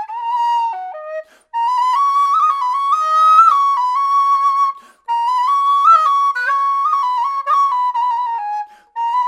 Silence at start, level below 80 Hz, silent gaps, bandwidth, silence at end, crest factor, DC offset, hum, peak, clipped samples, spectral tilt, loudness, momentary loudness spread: 0 s; -78 dBFS; none; 13.5 kHz; 0 s; 14 dB; under 0.1%; none; 0 dBFS; under 0.1%; 3 dB/octave; -14 LUFS; 14 LU